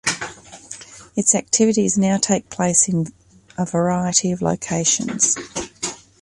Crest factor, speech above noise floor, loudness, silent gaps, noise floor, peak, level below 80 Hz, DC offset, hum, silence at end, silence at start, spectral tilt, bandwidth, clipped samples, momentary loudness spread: 20 dB; 20 dB; -19 LUFS; none; -39 dBFS; -2 dBFS; -54 dBFS; under 0.1%; none; 0.25 s; 0.05 s; -3.5 dB/octave; 11.5 kHz; under 0.1%; 15 LU